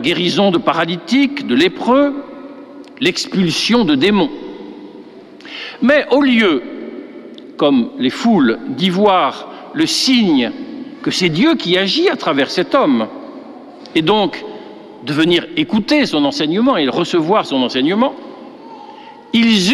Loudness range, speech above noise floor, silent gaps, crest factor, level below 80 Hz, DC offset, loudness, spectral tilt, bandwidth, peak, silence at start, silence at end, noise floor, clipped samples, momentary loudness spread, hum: 3 LU; 23 dB; none; 14 dB; -52 dBFS; under 0.1%; -14 LUFS; -4.5 dB/octave; 13.5 kHz; -2 dBFS; 0 s; 0 s; -36 dBFS; under 0.1%; 21 LU; none